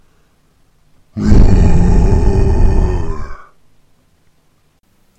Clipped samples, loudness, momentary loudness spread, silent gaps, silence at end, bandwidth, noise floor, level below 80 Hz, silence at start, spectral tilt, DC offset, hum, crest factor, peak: under 0.1%; -13 LUFS; 16 LU; none; 1.85 s; 8.2 kHz; -55 dBFS; -14 dBFS; 1.15 s; -8.5 dB/octave; under 0.1%; none; 12 dB; 0 dBFS